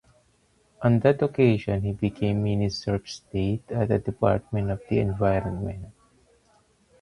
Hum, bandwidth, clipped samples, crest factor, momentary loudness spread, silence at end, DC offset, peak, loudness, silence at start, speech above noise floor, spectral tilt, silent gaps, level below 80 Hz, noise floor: none; 11 kHz; under 0.1%; 20 dB; 10 LU; 1.1 s; under 0.1%; -6 dBFS; -25 LUFS; 0.8 s; 40 dB; -8 dB/octave; none; -46 dBFS; -64 dBFS